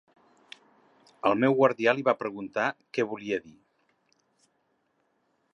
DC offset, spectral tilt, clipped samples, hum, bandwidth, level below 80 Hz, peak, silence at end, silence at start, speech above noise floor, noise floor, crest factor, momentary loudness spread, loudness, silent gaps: under 0.1%; -6.5 dB/octave; under 0.1%; none; 8.4 kHz; -76 dBFS; -8 dBFS; 2.05 s; 1.25 s; 47 dB; -73 dBFS; 22 dB; 10 LU; -27 LUFS; none